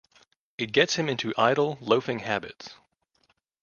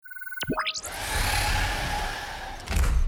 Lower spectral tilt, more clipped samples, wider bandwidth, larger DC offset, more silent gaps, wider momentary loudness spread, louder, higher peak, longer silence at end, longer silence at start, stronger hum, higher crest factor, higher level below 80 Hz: about the same, -4 dB/octave vs -3 dB/octave; neither; second, 7.2 kHz vs 19.5 kHz; neither; neither; first, 20 LU vs 10 LU; first, -25 LUFS vs -28 LUFS; first, -4 dBFS vs -12 dBFS; first, 0.9 s vs 0 s; first, 0.6 s vs 0.05 s; neither; first, 24 dB vs 14 dB; second, -68 dBFS vs -30 dBFS